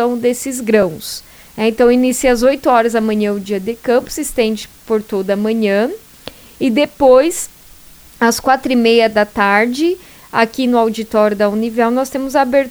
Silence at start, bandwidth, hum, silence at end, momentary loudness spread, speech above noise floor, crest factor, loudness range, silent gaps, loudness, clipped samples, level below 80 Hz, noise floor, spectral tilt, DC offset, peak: 0 s; over 20 kHz; none; 0 s; 10 LU; 27 dB; 14 dB; 3 LU; none; -14 LUFS; under 0.1%; -42 dBFS; -41 dBFS; -4 dB/octave; under 0.1%; 0 dBFS